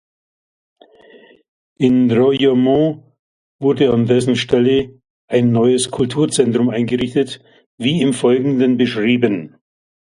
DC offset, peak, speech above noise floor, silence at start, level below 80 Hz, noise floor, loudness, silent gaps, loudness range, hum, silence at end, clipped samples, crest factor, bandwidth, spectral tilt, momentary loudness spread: under 0.1%; 0 dBFS; 31 dB; 1.8 s; -52 dBFS; -46 dBFS; -16 LUFS; 3.19-3.59 s, 5.10-5.28 s, 7.66-7.78 s; 2 LU; none; 0.65 s; under 0.1%; 16 dB; 11.5 kHz; -6 dB/octave; 7 LU